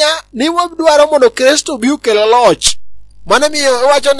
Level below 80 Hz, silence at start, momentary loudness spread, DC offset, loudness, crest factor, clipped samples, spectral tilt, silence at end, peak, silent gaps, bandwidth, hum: -42 dBFS; 0 s; 6 LU; under 0.1%; -10 LUFS; 10 dB; 0.3%; -2 dB/octave; 0 s; 0 dBFS; none; 12 kHz; 50 Hz at -45 dBFS